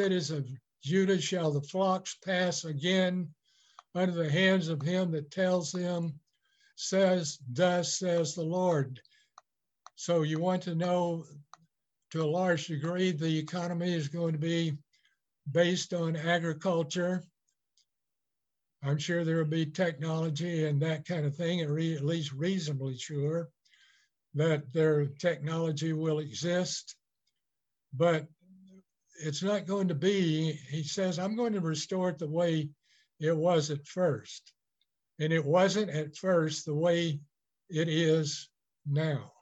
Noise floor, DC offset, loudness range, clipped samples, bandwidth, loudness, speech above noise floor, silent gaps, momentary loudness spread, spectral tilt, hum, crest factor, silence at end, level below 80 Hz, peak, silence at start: -89 dBFS; under 0.1%; 4 LU; under 0.1%; 8.4 kHz; -31 LUFS; 59 dB; none; 10 LU; -5.5 dB/octave; none; 18 dB; 0.1 s; -78 dBFS; -14 dBFS; 0 s